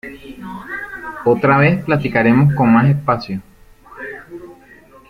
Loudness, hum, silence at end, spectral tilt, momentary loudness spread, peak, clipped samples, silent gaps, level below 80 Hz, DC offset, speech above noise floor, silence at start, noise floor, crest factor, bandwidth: -14 LUFS; none; 0.6 s; -9 dB/octave; 21 LU; -2 dBFS; under 0.1%; none; -46 dBFS; under 0.1%; 31 dB; 0.05 s; -44 dBFS; 16 dB; 5.4 kHz